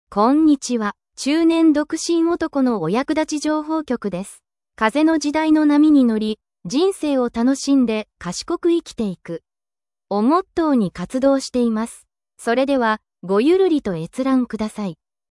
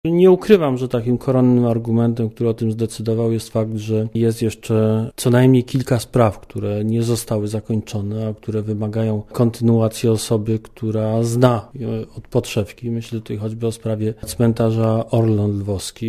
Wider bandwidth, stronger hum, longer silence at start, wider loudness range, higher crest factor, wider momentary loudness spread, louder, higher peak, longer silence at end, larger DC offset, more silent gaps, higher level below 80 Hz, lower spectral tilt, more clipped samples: second, 12 kHz vs 15 kHz; neither; about the same, 0.1 s vs 0.05 s; about the same, 4 LU vs 4 LU; about the same, 16 dB vs 18 dB; about the same, 11 LU vs 10 LU; about the same, -19 LUFS vs -19 LUFS; about the same, -2 dBFS vs 0 dBFS; first, 0.35 s vs 0 s; neither; neither; second, -54 dBFS vs -44 dBFS; second, -5 dB/octave vs -7 dB/octave; neither